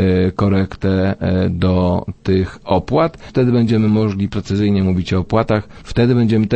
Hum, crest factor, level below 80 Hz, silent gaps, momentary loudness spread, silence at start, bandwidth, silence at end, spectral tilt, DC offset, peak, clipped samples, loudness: none; 14 dB; -38 dBFS; none; 5 LU; 0 s; 8.6 kHz; 0 s; -8.5 dB/octave; under 0.1%; -2 dBFS; under 0.1%; -17 LUFS